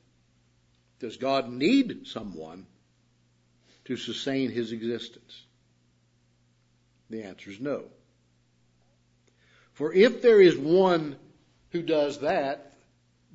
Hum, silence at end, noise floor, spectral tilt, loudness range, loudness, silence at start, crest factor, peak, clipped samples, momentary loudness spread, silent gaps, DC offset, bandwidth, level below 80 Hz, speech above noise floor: 60 Hz at -65 dBFS; 0.7 s; -66 dBFS; -6 dB/octave; 18 LU; -25 LUFS; 1 s; 22 dB; -6 dBFS; under 0.1%; 22 LU; none; under 0.1%; 8 kHz; -70 dBFS; 41 dB